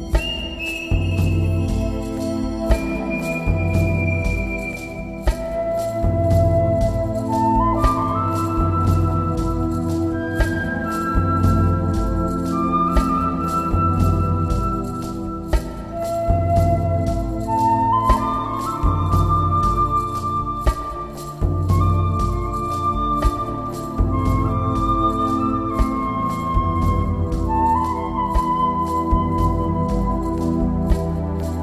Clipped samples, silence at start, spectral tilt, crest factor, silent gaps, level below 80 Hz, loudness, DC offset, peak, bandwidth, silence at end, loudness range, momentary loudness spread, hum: under 0.1%; 0 s; -7.5 dB/octave; 18 dB; none; -26 dBFS; -21 LUFS; under 0.1%; -2 dBFS; 14 kHz; 0 s; 3 LU; 7 LU; none